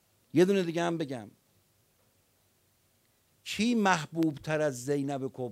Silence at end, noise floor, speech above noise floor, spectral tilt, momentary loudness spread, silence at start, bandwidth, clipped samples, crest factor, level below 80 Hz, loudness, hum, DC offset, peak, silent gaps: 0 s; -70 dBFS; 41 dB; -5.5 dB/octave; 12 LU; 0.35 s; 16 kHz; under 0.1%; 22 dB; -72 dBFS; -30 LUFS; none; under 0.1%; -10 dBFS; none